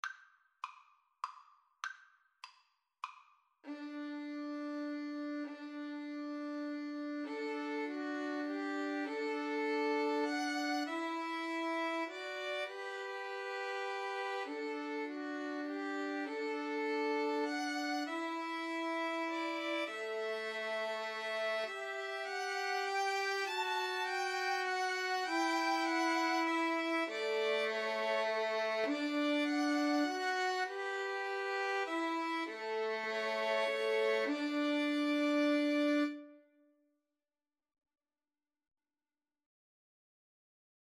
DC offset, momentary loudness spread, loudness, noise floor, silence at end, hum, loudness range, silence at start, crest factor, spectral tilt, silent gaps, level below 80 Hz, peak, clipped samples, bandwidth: under 0.1%; 11 LU; -37 LUFS; under -90 dBFS; 4.5 s; none; 9 LU; 0.05 s; 16 dB; -2 dB/octave; none; under -90 dBFS; -22 dBFS; under 0.1%; 13.5 kHz